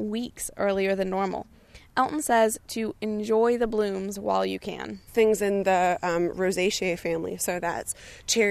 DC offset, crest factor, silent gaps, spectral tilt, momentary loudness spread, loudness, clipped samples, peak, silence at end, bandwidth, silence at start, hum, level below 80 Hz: under 0.1%; 16 dB; none; -4 dB/octave; 9 LU; -26 LUFS; under 0.1%; -10 dBFS; 0 s; 14 kHz; 0 s; none; -54 dBFS